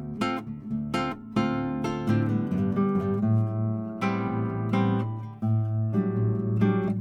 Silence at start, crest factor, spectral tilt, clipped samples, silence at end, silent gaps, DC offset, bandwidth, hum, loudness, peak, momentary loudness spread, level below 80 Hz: 0 s; 14 dB; -8.5 dB/octave; under 0.1%; 0 s; none; under 0.1%; 10 kHz; none; -27 LUFS; -12 dBFS; 5 LU; -56 dBFS